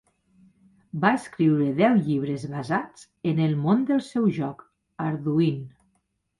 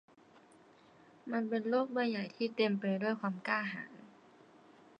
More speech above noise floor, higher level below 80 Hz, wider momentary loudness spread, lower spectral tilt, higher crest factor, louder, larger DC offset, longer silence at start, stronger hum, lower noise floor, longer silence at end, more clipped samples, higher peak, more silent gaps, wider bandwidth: first, 49 dB vs 28 dB; first, -64 dBFS vs -90 dBFS; about the same, 11 LU vs 13 LU; about the same, -8 dB/octave vs -7.5 dB/octave; about the same, 20 dB vs 20 dB; first, -24 LUFS vs -35 LUFS; neither; second, 0.95 s vs 1.25 s; neither; first, -73 dBFS vs -62 dBFS; second, 0.7 s vs 0.9 s; neither; first, -4 dBFS vs -18 dBFS; neither; first, 11.5 kHz vs 8.8 kHz